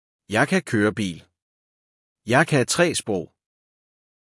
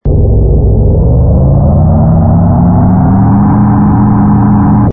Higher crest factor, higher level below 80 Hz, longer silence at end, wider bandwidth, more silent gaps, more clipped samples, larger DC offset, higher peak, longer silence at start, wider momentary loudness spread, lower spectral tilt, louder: first, 20 dB vs 6 dB; second, -64 dBFS vs -14 dBFS; first, 0.95 s vs 0 s; first, 12 kHz vs 2.4 kHz; first, 1.42-2.16 s vs none; neither; neither; second, -4 dBFS vs 0 dBFS; first, 0.3 s vs 0.05 s; first, 16 LU vs 2 LU; second, -4.5 dB/octave vs -15.5 dB/octave; second, -22 LUFS vs -7 LUFS